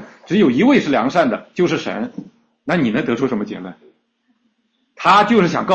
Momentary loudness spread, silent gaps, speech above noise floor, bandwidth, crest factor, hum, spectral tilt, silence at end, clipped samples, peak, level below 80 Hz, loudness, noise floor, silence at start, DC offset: 16 LU; none; 50 dB; 8.4 kHz; 16 dB; none; -6 dB/octave; 0 s; under 0.1%; -2 dBFS; -56 dBFS; -16 LUFS; -66 dBFS; 0 s; under 0.1%